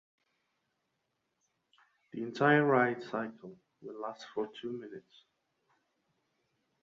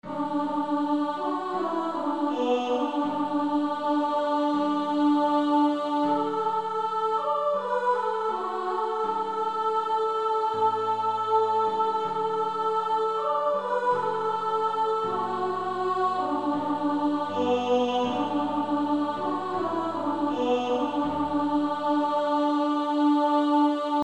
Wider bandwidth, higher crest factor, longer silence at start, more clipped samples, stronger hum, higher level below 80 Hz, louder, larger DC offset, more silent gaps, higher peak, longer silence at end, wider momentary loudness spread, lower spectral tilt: second, 7.6 kHz vs 9 kHz; first, 24 dB vs 14 dB; first, 2.15 s vs 0.05 s; neither; neither; second, -82 dBFS vs -66 dBFS; second, -32 LUFS vs -26 LUFS; second, under 0.1% vs 0.2%; neither; about the same, -14 dBFS vs -12 dBFS; first, 1.85 s vs 0 s; first, 25 LU vs 5 LU; about the same, -7 dB/octave vs -6 dB/octave